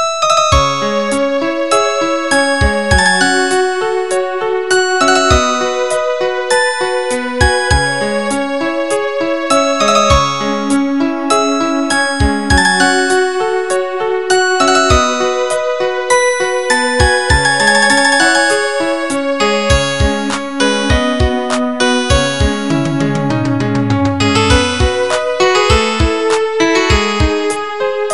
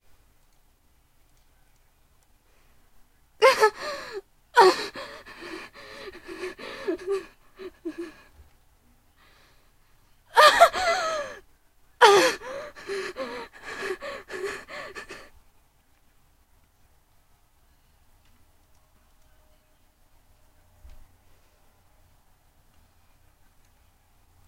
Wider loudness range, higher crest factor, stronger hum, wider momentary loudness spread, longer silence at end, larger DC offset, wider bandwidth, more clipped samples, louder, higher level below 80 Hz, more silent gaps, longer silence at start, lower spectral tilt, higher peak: second, 3 LU vs 17 LU; second, 12 dB vs 28 dB; neither; second, 6 LU vs 24 LU; second, 0 s vs 9.25 s; first, 2% vs under 0.1%; second, 12 kHz vs 16 kHz; neither; first, -12 LUFS vs -23 LUFS; first, -24 dBFS vs -58 dBFS; neither; second, 0 s vs 3.4 s; first, -4 dB/octave vs -1.5 dB/octave; about the same, 0 dBFS vs 0 dBFS